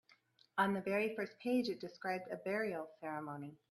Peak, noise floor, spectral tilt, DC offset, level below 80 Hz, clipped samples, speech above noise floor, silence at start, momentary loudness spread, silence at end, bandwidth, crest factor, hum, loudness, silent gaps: -20 dBFS; -71 dBFS; -6 dB/octave; under 0.1%; -84 dBFS; under 0.1%; 31 dB; 0.55 s; 9 LU; 0.15 s; 13.5 kHz; 20 dB; none; -40 LUFS; none